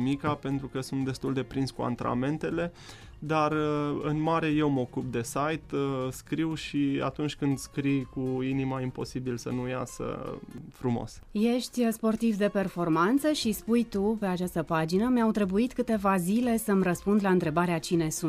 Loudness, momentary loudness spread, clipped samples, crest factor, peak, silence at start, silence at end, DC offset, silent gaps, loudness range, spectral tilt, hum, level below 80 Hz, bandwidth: -29 LUFS; 8 LU; under 0.1%; 16 dB; -14 dBFS; 0 s; 0 s; under 0.1%; none; 5 LU; -6 dB/octave; none; -52 dBFS; 15.5 kHz